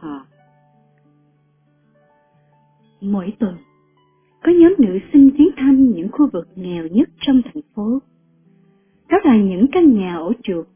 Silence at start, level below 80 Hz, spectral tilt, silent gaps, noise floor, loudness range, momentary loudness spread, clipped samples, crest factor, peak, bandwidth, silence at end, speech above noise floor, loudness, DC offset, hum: 0 s; -50 dBFS; -11.5 dB/octave; none; -58 dBFS; 15 LU; 15 LU; under 0.1%; 16 dB; -2 dBFS; 3.6 kHz; 0.1 s; 44 dB; -15 LUFS; under 0.1%; none